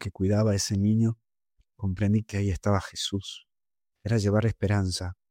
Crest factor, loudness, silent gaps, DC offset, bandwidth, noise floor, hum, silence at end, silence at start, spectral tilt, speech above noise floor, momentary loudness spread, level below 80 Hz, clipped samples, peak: 14 dB; -27 LUFS; none; under 0.1%; 15 kHz; under -90 dBFS; none; 0.15 s; 0 s; -6 dB/octave; over 64 dB; 11 LU; -50 dBFS; under 0.1%; -12 dBFS